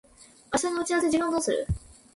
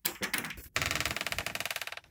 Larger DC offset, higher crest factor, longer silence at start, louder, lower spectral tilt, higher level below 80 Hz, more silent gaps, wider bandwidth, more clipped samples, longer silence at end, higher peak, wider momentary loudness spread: neither; second, 18 dB vs 26 dB; first, 0.5 s vs 0.05 s; first, -27 LUFS vs -33 LUFS; first, -4.5 dB/octave vs -1.5 dB/octave; first, -44 dBFS vs -56 dBFS; neither; second, 11.5 kHz vs 19 kHz; neither; first, 0.35 s vs 0.1 s; about the same, -10 dBFS vs -10 dBFS; first, 8 LU vs 5 LU